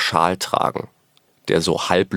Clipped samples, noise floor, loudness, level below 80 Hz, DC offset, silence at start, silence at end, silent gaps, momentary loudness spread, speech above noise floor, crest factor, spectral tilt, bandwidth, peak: under 0.1%; -59 dBFS; -20 LUFS; -56 dBFS; under 0.1%; 0 s; 0 s; none; 14 LU; 40 dB; 20 dB; -4 dB/octave; over 20 kHz; 0 dBFS